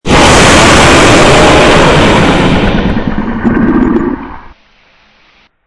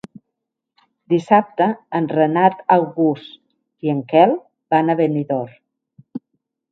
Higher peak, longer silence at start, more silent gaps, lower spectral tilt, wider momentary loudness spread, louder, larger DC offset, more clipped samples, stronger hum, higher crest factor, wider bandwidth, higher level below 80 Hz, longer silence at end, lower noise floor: about the same, 0 dBFS vs 0 dBFS; second, 0.05 s vs 1.1 s; neither; second, -4.5 dB/octave vs -8.5 dB/octave; second, 10 LU vs 16 LU; first, -5 LUFS vs -18 LUFS; neither; first, 3% vs under 0.1%; neither; second, 6 dB vs 18 dB; first, 12 kHz vs 7.8 kHz; first, -18 dBFS vs -68 dBFS; first, 1.25 s vs 0.55 s; second, -46 dBFS vs -79 dBFS